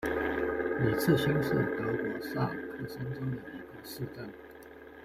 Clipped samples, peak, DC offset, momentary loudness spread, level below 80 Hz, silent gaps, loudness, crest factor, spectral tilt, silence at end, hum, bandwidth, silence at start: under 0.1%; -14 dBFS; under 0.1%; 18 LU; -56 dBFS; none; -32 LUFS; 20 dB; -6.5 dB/octave; 0 s; none; 16 kHz; 0 s